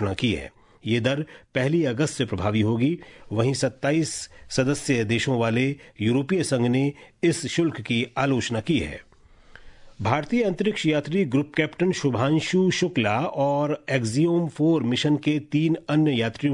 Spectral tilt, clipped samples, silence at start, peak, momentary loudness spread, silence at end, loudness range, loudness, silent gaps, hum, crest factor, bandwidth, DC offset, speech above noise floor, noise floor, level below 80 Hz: -5.5 dB/octave; under 0.1%; 0 s; -6 dBFS; 5 LU; 0 s; 3 LU; -24 LUFS; none; none; 18 dB; 11 kHz; under 0.1%; 27 dB; -50 dBFS; -54 dBFS